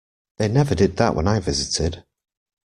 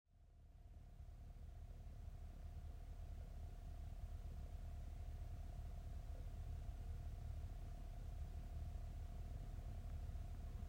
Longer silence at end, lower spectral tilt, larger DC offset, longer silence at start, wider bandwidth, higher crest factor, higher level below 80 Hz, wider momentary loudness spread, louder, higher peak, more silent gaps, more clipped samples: first, 0.8 s vs 0 s; second, -5.5 dB/octave vs -7 dB/octave; neither; first, 0.4 s vs 0.1 s; second, 11.5 kHz vs 16 kHz; first, 18 dB vs 12 dB; first, -40 dBFS vs -52 dBFS; about the same, 8 LU vs 7 LU; first, -21 LUFS vs -55 LUFS; first, -4 dBFS vs -38 dBFS; neither; neither